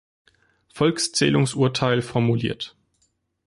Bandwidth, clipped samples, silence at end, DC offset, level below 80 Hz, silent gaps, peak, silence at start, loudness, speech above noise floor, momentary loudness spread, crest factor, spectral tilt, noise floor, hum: 11.5 kHz; under 0.1%; 0.8 s; under 0.1%; -56 dBFS; none; -6 dBFS; 0.75 s; -22 LUFS; 48 dB; 9 LU; 16 dB; -5 dB/octave; -69 dBFS; none